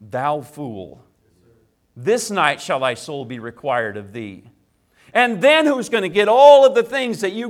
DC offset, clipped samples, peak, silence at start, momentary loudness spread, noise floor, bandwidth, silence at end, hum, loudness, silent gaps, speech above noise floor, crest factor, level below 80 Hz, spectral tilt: under 0.1%; under 0.1%; 0 dBFS; 0 s; 21 LU; -59 dBFS; 14 kHz; 0 s; none; -16 LUFS; none; 42 dB; 18 dB; -64 dBFS; -4 dB/octave